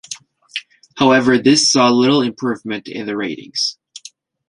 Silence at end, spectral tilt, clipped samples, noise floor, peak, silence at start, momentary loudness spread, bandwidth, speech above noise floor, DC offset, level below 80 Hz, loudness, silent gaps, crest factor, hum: 0.5 s; -3.5 dB/octave; under 0.1%; -43 dBFS; 0 dBFS; 0.1 s; 20 LU; 11.5 kHz; 28 dB; under 0.1%; -58 dBFS; -15 LUFS; none; 16 dB; none